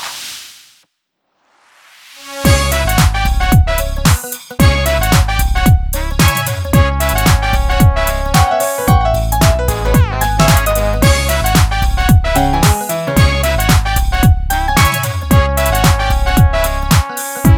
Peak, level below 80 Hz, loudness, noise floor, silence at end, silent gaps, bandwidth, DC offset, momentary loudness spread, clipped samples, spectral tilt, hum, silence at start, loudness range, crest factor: 0 dBFS; -16 dBFS; -13 LUFS; -68 dBFS; 0 s; none; 19 kHz; under 0.1%; 5 LU; under 0.1%; -5 dB/octave; none; 0 s; 2 LU; 12 dB